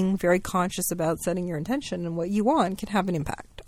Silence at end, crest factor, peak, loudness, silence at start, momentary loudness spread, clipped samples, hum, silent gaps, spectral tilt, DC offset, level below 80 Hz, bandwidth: 0.05 s; 18 dB; -8 dBFS; -26 LUFS; 0 s; 7 LU; under 0.1%; none; none; -5.5 dB/octave; under 0.1%; -50 dBFS; 16.5 kHz